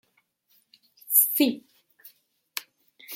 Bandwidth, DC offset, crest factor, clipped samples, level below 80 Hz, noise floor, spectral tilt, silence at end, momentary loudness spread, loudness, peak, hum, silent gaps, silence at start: 16.5 kHz; under 0.1%; 24 dB; under 0.1%; -84 dBFS; -69 dBFS; -1.5 dB/octave; 0 s; 18 LU; -21 LUFS; -6 dBFS; none; none; 1.1 s